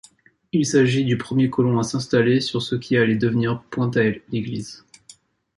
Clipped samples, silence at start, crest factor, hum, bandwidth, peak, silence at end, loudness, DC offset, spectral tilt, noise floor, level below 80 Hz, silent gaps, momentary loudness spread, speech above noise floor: under 0.1%; 0.55 s; 16 dB; none; 11.5 kHz; -4 dBFS; 0.8 s; -21 LUFS; under 0.1%; -6 dB/octave; -54 dBFS; -56 dBFS; none; 9 LU; 34 dB